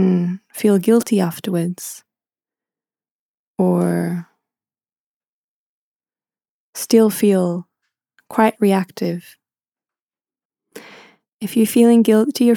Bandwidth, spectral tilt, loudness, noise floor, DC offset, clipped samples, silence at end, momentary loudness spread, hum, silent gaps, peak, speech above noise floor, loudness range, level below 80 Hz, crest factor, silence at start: 19 kHz; -6.5 dB/octave; -17 LUFS; under -90 dBFS; under 0.1%; under 0.1%; 0 s; 16 LU; none; 3.11-3.55 s, 4.99-5.20 s, 5.27-6.00 s, 6.49-6.73 s, 10.02-10.07 s, 10.45-10.50 s, 11.33-11.38 s; 0 dBFS; over 74 dB; 6 LU; -70 dBFS; 18 dB; 0 s